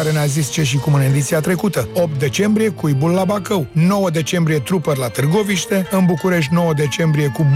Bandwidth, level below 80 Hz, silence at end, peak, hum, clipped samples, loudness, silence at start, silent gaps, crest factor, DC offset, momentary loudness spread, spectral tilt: 16 kHz; -48 dBFS; 0 s; -4 dBFS; none; under 0.1%; -17 LUFS; 0 s; none; 12 dB; under 0.1%; 3 LU; -6 dB/octave